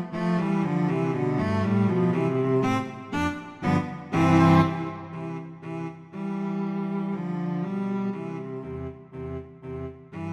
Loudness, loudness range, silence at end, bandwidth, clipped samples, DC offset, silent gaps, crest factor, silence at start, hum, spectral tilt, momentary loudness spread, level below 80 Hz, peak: -26 LUFS; 8 LU; 0 s; 9.8 kHz; under 0.1%; under 0.1%; none; 20 dB; 0 s; none; -8 dB/octave; 16 LU; -54 dBFS; -6 dBFS